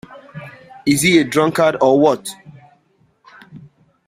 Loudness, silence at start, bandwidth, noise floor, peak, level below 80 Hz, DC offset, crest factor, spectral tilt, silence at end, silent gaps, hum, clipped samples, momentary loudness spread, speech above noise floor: -15 LUFS; 0.1 s; 16 kHz; -59 dBFS; 0 dBFS; -56 dBFS; under 0.1%; 18 dB; -4.5 dB/octave; 0.5 s; none; none; under 0.1%; 23 LU; 45 dB